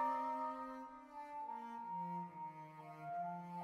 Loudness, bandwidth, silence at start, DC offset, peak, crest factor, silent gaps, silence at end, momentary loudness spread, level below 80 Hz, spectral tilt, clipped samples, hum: -47 LUFS; 13 kHz; 0 s; under 0.1%; -30 dBFS; 16 dB; none; 0 s; 11 LU; -84 dBFS; -7.5 dB/octave; under 0.1%; none